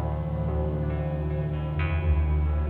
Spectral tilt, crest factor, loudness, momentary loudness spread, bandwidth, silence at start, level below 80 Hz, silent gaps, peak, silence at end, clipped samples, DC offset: -11 dB/octave; 12 dB; -28 LUFS; 4 LU; 4 kHz; 0 s; -30 dBFS; none; -14 dBFS; 0 s; under 0.1%; under 0.1%